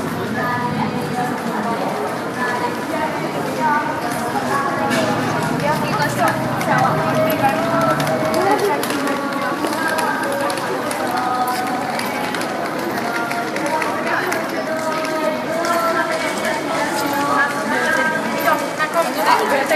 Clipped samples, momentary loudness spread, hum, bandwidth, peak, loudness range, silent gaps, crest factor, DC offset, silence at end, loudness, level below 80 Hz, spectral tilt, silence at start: under 0.1%; 5 LU; none; 15.5 kHz; -2 dBFS; 3 LU; none; 18 dB; under 0.1%; 0 s; -19 LUFS; -56 dBFS; -4.5 dB/octave; 0 s